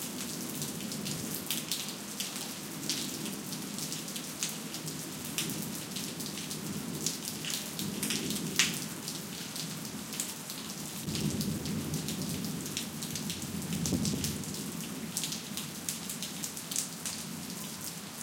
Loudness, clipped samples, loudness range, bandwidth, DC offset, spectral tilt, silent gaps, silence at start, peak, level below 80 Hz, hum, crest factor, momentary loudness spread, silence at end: -35 LUFS; under 0.1%; 3 LU; 17 kHz; under 0.1%; -3 dB/octave; none; 0 s; -8 dBFS; -62 dBFS; none; 30 dB; 6 LU; 0 s